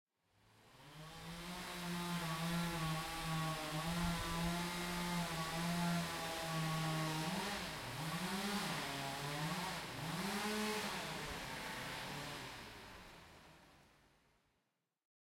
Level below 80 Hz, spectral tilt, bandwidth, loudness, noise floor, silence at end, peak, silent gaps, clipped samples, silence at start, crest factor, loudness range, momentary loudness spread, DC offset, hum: -60 dBFS; -4 dB/octave; 16.5 kHz; -41 LUFS; -86 dBFS; 1.5 s; -26 dBFS; none; under 0.1%; 0.55 s; 16 dB; 8 LU; 13 LU; under 0.1%; none